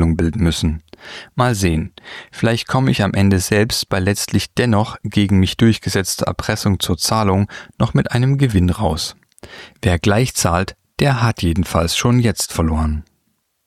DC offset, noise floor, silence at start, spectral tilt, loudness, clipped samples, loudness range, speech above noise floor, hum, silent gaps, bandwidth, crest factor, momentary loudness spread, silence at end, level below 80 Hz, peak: under 0.1%; -67 dBFS; 0 s; -5 dB/octave; -17 LUFS; under 0.1%; 2 LU; 50 dB; none; none; 15.5 kHz; 16 dB; 9 LU; 0.65 s; -32 dBFS; -2 dBFS